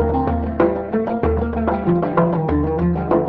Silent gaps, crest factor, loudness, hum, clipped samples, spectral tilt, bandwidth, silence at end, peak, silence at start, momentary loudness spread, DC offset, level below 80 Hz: none; 14 dB; -19 LUFS; none; under 0.1%; -11.5 dB/octave; 4.8 kHz; 0 s; -4 dBFS; 0 s; 3 LU; under 0.1%; -28 dBFS